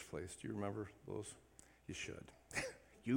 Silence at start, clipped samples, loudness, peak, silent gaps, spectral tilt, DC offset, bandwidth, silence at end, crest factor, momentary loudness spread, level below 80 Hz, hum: 0 s; under 0.1%; -48 LUFS; -26 dBFS; none; -5 dB/octave; under 0.1%; 17.5 kHz; 0 s; 20 dB; 12 LU; -70 dBFS; none